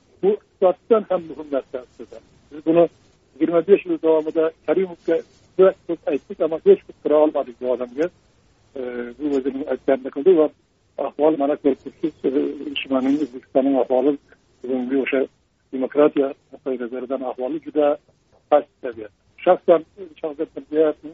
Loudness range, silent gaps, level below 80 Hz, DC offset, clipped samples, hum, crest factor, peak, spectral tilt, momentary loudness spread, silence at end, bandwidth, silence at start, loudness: 3 LU; none; -64 dBFS; under 0.1%; under 0.1%; none; 20 dB; -2 dBFS; -5 dB/octave; 14 LU; 0 s; 7 kHz; 0.25 s; -21 LUFS